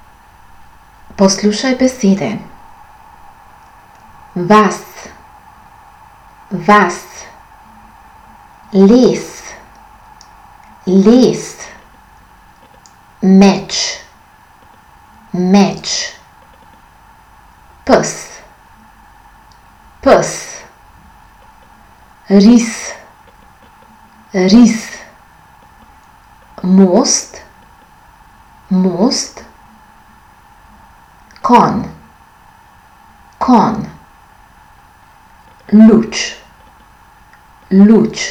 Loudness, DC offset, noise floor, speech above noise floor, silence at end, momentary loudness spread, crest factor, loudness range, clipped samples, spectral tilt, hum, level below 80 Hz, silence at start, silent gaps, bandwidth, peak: -11 LUFS; under 0.1%; -44 dBFS; 34 dB; 0 s; 22 LU; 14 dB; 6 LU; 0.4%; -5 dB/octave; none; -46 dBFS; 1.2 s; none; 13.5 kHz; 0 dBFS